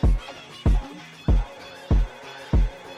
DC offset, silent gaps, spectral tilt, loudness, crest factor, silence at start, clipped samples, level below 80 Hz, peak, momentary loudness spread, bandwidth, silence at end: under 0.1%; none; -7.5 dB/octave; -26 LUFS; 10 dB; 0.05 s; under 0.1%; -24 dBFS; -12 dBFS; 14 LU; 8 kHz; 0 s